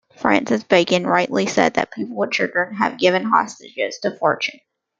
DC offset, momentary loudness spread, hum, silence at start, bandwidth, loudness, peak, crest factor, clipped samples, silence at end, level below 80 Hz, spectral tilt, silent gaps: under 0.1%; 9 LU; none; 0.2 s; 9.2 kHz; -19 LUFS; -2 dBFS; 18 dB; under 0.1%; 0.45 s; -60 dBFS; -4.5 dB/octave; none